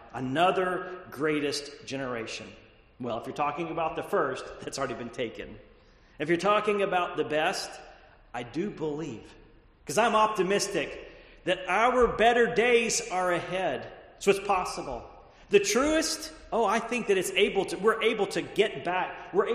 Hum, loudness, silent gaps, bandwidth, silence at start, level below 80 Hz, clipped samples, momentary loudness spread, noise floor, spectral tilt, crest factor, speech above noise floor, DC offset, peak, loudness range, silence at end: none; -28 LUFS; none; 13 kHz; 0 s; -54 dBFS; under 0.1%; 15 LU; -55 dBFS; -3.5 dB/octave; 20 dB; 28 dB; under 0.1%; -8 dBFS; 7 LU; 0 s